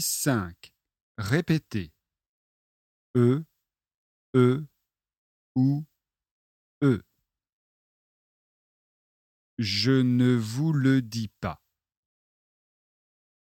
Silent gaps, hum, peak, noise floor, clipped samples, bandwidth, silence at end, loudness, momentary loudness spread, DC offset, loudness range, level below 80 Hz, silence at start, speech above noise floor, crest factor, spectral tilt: 1.01-1.15 s, 2.27-3.14 s, 3.97-4.33 s, 5.18-5.55 s, 6.31-6.81 s, 7.53-9.57 s; none; -8 dBFS; under -90 dBFS; under 0.1%; 16.5 kHz; 1.95 s; -26 LUFS; 14 LU; under 0.1%; 7 LU; -62 dBFS; 0 s; over 66 dB; 20 dB; -5.5 dB/octave